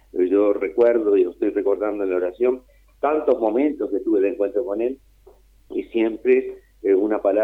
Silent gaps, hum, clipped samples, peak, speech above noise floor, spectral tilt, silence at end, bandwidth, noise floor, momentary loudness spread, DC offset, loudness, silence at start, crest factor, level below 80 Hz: none; none; under 0.1%; -6 dBFS; 31 dB; -7.5 dB/octave; 0 s; 3.9 kHz; -52 dBFS; 9 LU; under 0.1%; -21 LUFS; 0.15 s; 14 dB; -56 dBFS